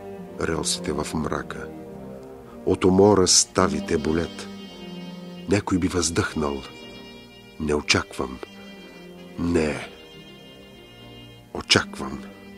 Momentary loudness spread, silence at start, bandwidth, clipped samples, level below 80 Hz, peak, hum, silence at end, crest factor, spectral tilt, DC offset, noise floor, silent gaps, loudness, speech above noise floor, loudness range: 26 LU; 0 s; 15.5 kHz; under 0.1%; -46 dBFS; -2 dBFS; none; 0 s; 24 dB; -3.5 dB/octave; under 0.1%; -45 dBFS; none; -22 LUFS; 23 dB; 7 LU